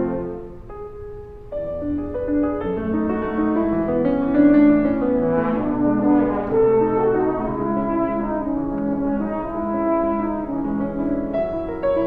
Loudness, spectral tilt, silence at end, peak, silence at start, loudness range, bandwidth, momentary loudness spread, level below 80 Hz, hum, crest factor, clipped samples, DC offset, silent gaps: -21 LUFS; -11 dB/octave; 0 s; -4 dBFS; 0 s; 6 LU; 4.2 kHz; 12 LU; -40 dBFS; none; 16 dB; under 0.1%; under 0.1%; none